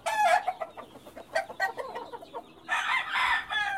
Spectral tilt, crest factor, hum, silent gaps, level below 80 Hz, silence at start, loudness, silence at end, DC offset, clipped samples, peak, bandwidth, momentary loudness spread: -1 dB/octave; 18 dB; none; none; -64 dBFS; 0.05 s; -28 LUFS; 0 s; under 0.1%; under 0.1%; -12 dBFS; 16 kHz; 19 LU